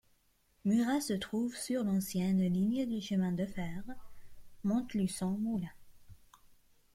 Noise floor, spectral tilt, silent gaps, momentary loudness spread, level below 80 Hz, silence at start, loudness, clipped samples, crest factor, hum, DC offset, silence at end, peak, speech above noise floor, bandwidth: -72 dBFS; -6 dB/octave; none; 11 LU; -62 dBFS; 0.65 s; -34 LUFS; under 0.1%; 14 dB; none; under 0.1%; 0.4 s; -20 dBFS; 39 dB; 15.5 kHz